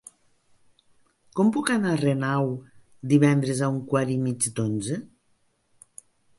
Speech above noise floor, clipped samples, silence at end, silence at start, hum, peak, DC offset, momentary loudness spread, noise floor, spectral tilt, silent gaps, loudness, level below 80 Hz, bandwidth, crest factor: 44 dB; under 0.1%; 1.3 s; 1.35 s; none; -6 dBFS; under 0.1%; 12 LU; -67 dBFS; -6 dB/octave; none; -24 LUFS; -64 dBFS; 11.5 kHz; 20 dB